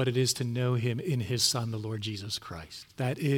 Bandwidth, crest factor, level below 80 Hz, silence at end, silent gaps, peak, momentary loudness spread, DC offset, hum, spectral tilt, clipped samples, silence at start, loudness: 17 kHz; 18 dB; -64 dBFS; 0 s; none; -12 dBFS; 10 LU; under 0.1%; none; -4.5 dB/octave; under 0.1%; 0 s; -30 LUFS